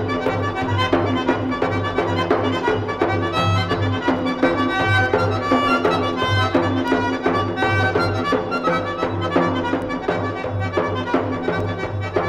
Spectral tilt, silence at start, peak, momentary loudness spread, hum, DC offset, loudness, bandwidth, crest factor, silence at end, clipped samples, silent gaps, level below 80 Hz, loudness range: -6.5 dB/octave; 0 s; -4 dBFS; 5 LU; none; under 0.1%; -20 LUFS; 10.5 kHz; 16 dB; 0 s; under 0.1%; none; -44 dBFS; 3 LU